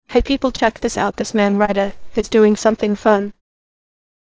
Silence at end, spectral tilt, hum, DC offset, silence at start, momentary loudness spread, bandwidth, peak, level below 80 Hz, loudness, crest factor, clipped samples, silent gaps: 1.1 s; -5 dB/octave; none; under 0.1%; 0.1 s; 7 LU; 8 kHz; 0 dBFS; -38 dBFS; -17 LUFS; 18 dB; under 0.1%; none